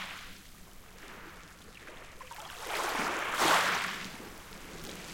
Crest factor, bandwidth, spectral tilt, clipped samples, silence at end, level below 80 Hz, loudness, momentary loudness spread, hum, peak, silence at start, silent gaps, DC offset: 22 dB; 17 kHz; -1.5 dB/octave; under 0.1%; 0 s; -58 dBFS; -31 LUFS; 24 LU; none; -14 dBFS; 0 s; none; under 0.1%